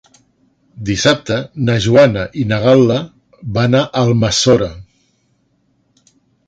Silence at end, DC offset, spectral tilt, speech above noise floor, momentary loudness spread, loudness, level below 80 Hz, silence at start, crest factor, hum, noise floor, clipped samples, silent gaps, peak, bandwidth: 1.65 s; under 0.1%; -5.5 dB/octave; 48 dB; 11 LU; -14 LUFS; -42 dBFS; 0.75 s; 16 dB; none; -60 dBFS; under 0.1%; none; 0 dBFS; 9.2 kHz